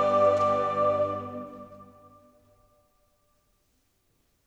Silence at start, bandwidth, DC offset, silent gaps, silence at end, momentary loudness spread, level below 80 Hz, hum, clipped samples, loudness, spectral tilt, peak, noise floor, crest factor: 0 s; 8.2 kHz; under 0.1%; none; 2.65 s; 22 LU; -70 dBFS; none; under 0.1%; -25 LUFS; -6.5 dB/octave; -12 dBFS; -71 dBFS; 18 dB